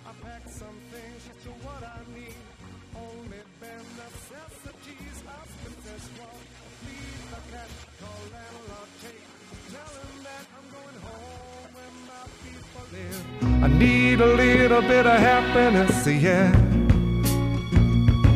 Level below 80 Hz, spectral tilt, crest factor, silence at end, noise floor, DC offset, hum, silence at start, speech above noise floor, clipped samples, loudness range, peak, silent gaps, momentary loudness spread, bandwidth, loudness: -34 dBFS; -6.5 dB/octave; 18 dB; 0 s; -47 dBFS; under 0.1%; none; 0.05 s; 28 dB; under 0.1%; 25 LU; -6 dBFS; none; 27 LU; 15.5 kHz; -19 LUFS